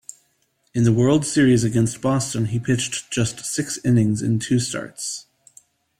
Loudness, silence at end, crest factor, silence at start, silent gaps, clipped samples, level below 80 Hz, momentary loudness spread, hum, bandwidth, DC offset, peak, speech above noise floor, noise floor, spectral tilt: -21 LUFS; 0.8 s; 16 dB; 0.75 s; none; under 0.1%; -52 dBFS; 12 LU; none; 15 kHz; under 0.1%; -6 dBFS; 47 dB; -67 dBFS; -5.5 dB/octave